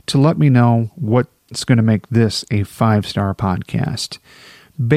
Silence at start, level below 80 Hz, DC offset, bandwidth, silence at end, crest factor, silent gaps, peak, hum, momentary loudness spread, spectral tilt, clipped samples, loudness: 0.1 s; -48 dBFS; 0.1%; 14 kHz; 0 s; 14 dB; none; -2 dBFS; none; 12 LU; -6.5 dB/octave; under 0.1%; -17 LUFS